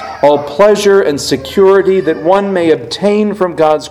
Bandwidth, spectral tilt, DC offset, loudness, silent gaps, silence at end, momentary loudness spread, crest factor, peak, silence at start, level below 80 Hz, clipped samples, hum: 14.5 kHz; -5 dB/octave; under 0.1%; -11 LUFS; none; 0 s; 5 LU; 10 dB; 0 dBFS; 0 s; -46 dBFS; 0.6%; none